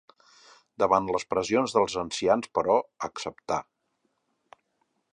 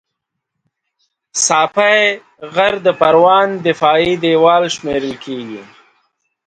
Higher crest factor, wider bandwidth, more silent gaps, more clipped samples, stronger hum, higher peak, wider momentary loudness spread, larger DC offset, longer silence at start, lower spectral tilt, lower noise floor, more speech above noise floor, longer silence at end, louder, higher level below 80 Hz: first, 22 dB vs 14 dB; first, 11 kHz vs 9.4 kHz; neither; neither; neither; second, -6 dBFS vs 0 dBFS; second, 10 LU vs 15 LU; neither; second, 0.8 s vs 1.35 s; about the same, -4 dB/octave vs -3 dB/octave; about the same, -76 dBFS vs -77 dBFS; second, 49 dB vs 63 dB; first, 1.5 s vs 0.85 s; second, -27 LUFS vs -13 LUFS; second, -62 dBFS vs -54 dBFS